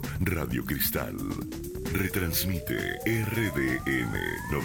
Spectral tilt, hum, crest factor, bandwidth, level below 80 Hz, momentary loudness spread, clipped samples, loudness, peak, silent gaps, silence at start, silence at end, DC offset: -5 dB/octave; none; 16 dB; 19 kHz; -42 dBFS; 7 LU; under 0.1%; -29 LUFS; -14 dBFS; none; 0 s; 0 s; under 0.1%